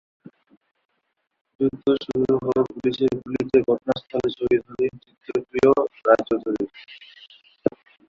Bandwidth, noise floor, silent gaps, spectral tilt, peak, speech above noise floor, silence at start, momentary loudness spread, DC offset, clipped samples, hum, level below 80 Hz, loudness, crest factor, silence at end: 7.4 kHz; -74 dBFS; none; -7 dB/octave; -2 dBFS; 52 dB; 1.6 s; 10 LU; under 0.1%; under 0.1%; none; -56 dBFS; -23 LUFS; 22 dB; 0.4 s